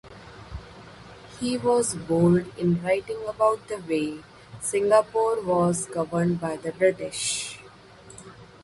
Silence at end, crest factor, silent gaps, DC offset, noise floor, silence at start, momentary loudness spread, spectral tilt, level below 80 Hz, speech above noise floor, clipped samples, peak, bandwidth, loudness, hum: 0.2 s; 20 dB; none; under 0.1%; -48 dBFS; 0.05 s; 24 LU; -5 dB/octave; -54 dBFS; 24 dB; under 0.1%; -6 dBFS; 11.5 kHz; -25 LUFS; none